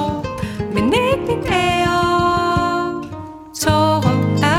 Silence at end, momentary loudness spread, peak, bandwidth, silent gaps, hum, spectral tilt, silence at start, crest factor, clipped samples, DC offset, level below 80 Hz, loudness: 0 s; 10 LU; -2 dBFS; 16.5 kHz; none; none; -5.5 dB/octave; 0 s; 16 dB; under 0.1%; under 0.1%; -38 dBFS; -17 LUFS